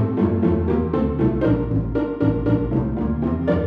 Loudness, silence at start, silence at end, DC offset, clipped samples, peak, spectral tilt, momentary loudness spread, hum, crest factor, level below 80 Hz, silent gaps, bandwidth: -21 LUFS; 0 s; 0 s; under 0.1%; under 0.1%; -6 dBFS; -11 dB/octave; 3 LU; none; 14 dB; -32 dBFS; none; 5 kHz